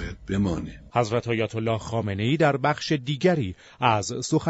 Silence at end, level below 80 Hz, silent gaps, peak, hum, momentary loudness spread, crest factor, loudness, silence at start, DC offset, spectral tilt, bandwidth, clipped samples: 0 s; -46 dBFS; none; -4 dBFS; none; 7 LU; 20 dB; -25 LUFS; 0 s; under 0.1%; -5.5 dB/octave; 8.2 kHz; under 0.1%